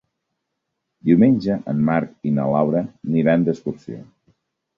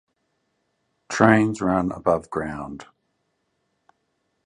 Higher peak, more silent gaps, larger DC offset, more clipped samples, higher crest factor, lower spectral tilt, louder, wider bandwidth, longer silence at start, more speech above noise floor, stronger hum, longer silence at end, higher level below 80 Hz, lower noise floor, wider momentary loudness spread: second, -4 dBFS vs 0 dBFS; neither; neither; neither; second, 18 dB vs 24 dB; first, -10 dB/octave vs -6.5 dB/octave; about the same, -19 LUFS vs -21 LUFS; second, 6.8 kHz vs 10.5 kHz; about the same, 1.05 s vs 1.1 s; first, 59 dB vs 52 dB; neither; second, 0.75 s vs 1.65 s; about the same, -56 dBFS vs -52 dBFS; first, -78 dBFS vs -73 dBFS; second, 14 LU vs 18 LU